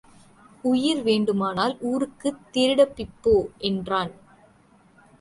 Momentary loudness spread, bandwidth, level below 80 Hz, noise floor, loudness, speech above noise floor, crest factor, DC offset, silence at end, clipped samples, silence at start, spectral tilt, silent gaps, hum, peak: 7 LU; 11.5 kHz; -50 dBFS; -57 dBFS; -24 LUFS; 34 dB; 18 dB; under 0.1%; 1.1 s; under 0.1%; 0.65 s; -5.5 dB/octave; none; none; -6 dBFS